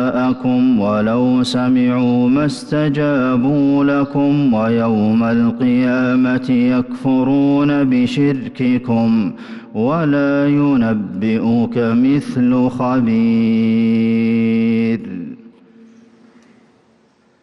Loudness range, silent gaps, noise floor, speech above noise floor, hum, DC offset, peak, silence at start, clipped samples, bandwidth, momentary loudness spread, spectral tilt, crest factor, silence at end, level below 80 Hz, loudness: 2 LU; none; -54 dBFS; 40 dB; none; under 0.1%; -8 dBFS; 0 s; under 0.1%; 10.5 kHz; 4 LU; -8 dB/octave; 8 dB; 1.95 s; -50 dBFS; -15 LUFS